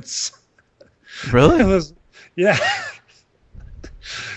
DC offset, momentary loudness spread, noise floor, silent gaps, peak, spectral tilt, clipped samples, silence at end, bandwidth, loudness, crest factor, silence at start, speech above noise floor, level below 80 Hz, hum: under 0.1%; 21 LU; -56 dBFS; none; 0 dBFS; -5 dB/octave; under 0.1%; 0 s; 9.4 kHz; -18 LUFS; 20 dB; 0.05 s; 40 dB; -36 dBFS; none